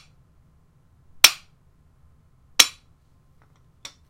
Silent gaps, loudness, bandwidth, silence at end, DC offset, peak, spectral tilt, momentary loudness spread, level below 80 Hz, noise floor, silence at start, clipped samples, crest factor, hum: none; -17 LUFS; 16 kHz; 1.4 s; under 0.1%; 0 dBFS; 2 dB/octave; 14 LU; -58 dBFS; -58 dBFS; 1.25 s; under 0.1%; 26 dB; none